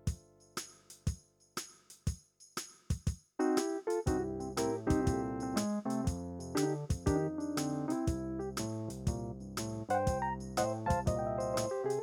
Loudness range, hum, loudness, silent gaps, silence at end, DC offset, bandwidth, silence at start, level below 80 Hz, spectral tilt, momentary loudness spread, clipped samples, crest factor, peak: 4 LU; none; -36 LUFS; none; 0 s; under 0.1%; 18.5 kHz; 0.05 s; -46 dBFS; -5.5 dB/octave; 11 LU; under 0.1%; 18 dB; -18 dBFS